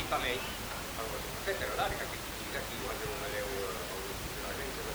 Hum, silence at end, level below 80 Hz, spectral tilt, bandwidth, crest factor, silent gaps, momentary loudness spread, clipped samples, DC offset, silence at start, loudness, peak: none; 0 s; -48 dBFS; -3 dB/octave; over 20 kHz; 18 dB; none; 5 LU; under 0.1%; under 0.1%; 0 s; -36 LUFS; -20 dBFS